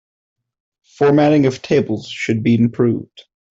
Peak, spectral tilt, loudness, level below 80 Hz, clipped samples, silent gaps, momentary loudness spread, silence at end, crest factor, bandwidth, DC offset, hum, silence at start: -4 dBFS; -7.5 dB/octave; -16 LUFS; -54 dBFS; under 0.1%; none; 9 LU; 0.45 s; 14 dB; 7.8 kHz; under 0.1%; none; 1 s